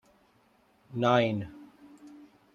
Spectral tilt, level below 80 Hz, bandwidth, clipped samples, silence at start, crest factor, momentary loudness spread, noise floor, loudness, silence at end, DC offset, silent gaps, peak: -7 dB/octave; -68 dBFS; 7.4 kHz; under 0.1%; 0.9 s; 24 dB; 27 LU; -66 dBFS; -28 LUFS; 0.4 s; under 0.1%; none; -10 dBFS